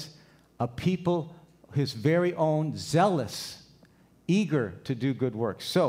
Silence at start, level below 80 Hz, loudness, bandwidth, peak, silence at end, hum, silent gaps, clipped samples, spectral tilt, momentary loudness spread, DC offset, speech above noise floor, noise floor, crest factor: 0 s; -62 dBFS; -28 LUFS; 16 kHz; -12 dBFS; 0 s; none; none; under 0.1%; -6.5 dB/octave; 13 LU; under 0.1%; 32 dB; -59 dBFS; 18 dB